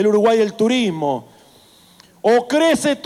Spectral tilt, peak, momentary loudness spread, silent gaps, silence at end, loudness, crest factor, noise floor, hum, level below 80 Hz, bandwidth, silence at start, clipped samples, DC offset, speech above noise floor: -4.5 dB/octave; -4 dBFS; 8 LU; none; 0.05 s; -17 LUFS; 14 dB; -49 dBFS; none; -60 dBFS; 15 kHz; 0 s; under 0.1%; under 0.1%; 33 dB